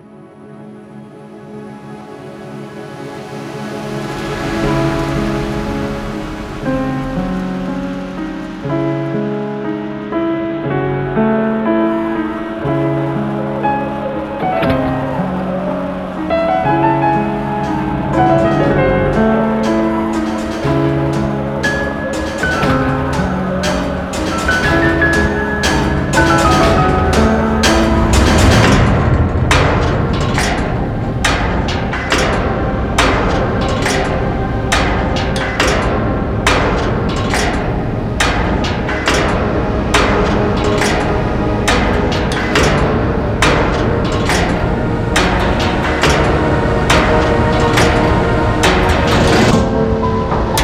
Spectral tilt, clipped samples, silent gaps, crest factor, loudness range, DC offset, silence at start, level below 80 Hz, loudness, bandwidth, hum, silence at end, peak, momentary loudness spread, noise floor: -5.5 dB/octave; under 0.1%; none; 14 dB; 8 LU; under 0.1%; 0.05 s; -24 dBFS; -15 LUFS; 16 kHz; none; 0 s; 0 dBFS; 10 LU; -36 dBFS